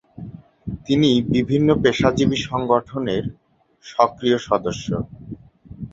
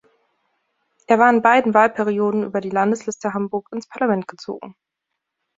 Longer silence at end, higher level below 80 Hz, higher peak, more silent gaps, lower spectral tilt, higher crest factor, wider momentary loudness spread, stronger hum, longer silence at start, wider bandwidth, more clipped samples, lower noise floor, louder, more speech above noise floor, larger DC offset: second, 0.05 s vs 0.85 s; first, -44 dBFS vs -66 dBFS; about the same, -2 dBFS vs -2 dBFS; neither; about the same, -6 dB/octave vs -6 dB/octave; about the same, 20 dB vs 18 dB; first, 21 LU vs 17 LU; neither; second, 0.2 s vs 1.1 s; about the same, 7.8 kHz vs 7.8 kHz; neither; second, -39 dBFS vs -80 dBFS; about the same, -20 LUFS vs -18 LUFS; second, 20 dB vs 61 dB; neither